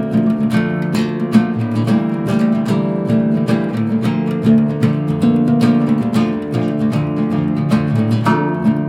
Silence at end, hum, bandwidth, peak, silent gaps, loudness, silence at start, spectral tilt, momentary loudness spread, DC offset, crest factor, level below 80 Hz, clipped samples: 0 s; none; 12 kHz; 0 dBFS; none; -16 LUFS; 0 s; -8 dB/octave; 4 LU; under 0.1%; 14 dB; -50 dBFS; under 0.1%